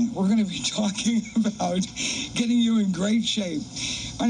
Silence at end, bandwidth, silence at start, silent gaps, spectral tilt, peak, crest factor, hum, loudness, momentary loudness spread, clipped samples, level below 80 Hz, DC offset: 0 s; 10.5 kHz; 0 s; none; -4 dB/octave; -14 dBFS; 10 dB; none; -24 LUFS; 6 LU; under 0.1%; -52 dBFS; under 0.1%